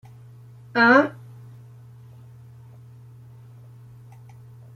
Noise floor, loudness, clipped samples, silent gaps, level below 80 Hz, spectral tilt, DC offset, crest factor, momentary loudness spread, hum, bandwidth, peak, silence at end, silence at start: -45 dBFS; -18 LUFS; under 0.1%; none; -66 dBFS; -6.5 dB/octave; under 0.1%; 24 dB; 29 LU; none; 9 kHz; -4 dBFS; 3.65 s; 0.75 s